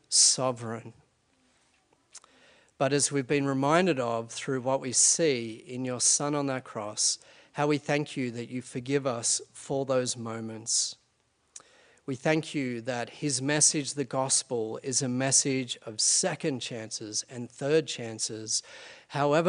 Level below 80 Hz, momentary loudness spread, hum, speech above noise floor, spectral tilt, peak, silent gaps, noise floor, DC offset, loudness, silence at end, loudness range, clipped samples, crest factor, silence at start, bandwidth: -74 dBFS; 14 LU; none; 43 dB; -3 dB/octave; -8 dBFS; none; -71 dBFS; under 0.1%; -27 LUFS; 0 s; 5 LU; under 0.1%; 22 dB; 0.1 s; 10.5 kHz